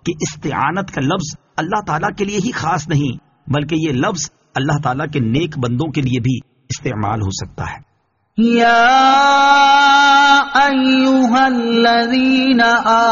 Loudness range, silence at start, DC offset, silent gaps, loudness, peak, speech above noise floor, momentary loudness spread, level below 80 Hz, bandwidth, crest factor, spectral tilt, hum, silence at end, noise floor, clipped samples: 9 LU; 0.05 s; under 0.1%; none; -14 LUFS; 0 dBFS; 37 dB; 14 LU; -46 dBFS; 7.4 kHz; 14 dB; -3.5 dB/octave; none; 0 s; -51 dBFS; under 0.1%